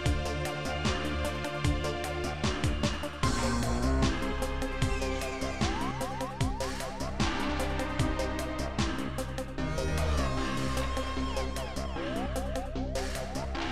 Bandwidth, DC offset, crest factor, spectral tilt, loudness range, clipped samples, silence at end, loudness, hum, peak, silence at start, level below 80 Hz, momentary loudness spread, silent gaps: 15 kHz; 0.7%; 18 dB; -5 dB/octave; 2 LU; under 0.1%; 0 s; -32 LUFS; none; -14 dBFS; 0 s; -36 dBFS; 5 LU; none